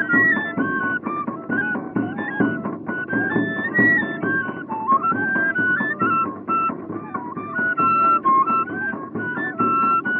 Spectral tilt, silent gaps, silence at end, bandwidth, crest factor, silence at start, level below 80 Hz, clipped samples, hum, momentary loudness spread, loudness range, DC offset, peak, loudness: -5 dB/octave; none; 0 s; 4.3 kHz; 16 dB; 0 s; -64 dBFS; under 0.1%; none; 11 LU; 2 LU; under 0.1%; -4 dBFS; -20 LUFS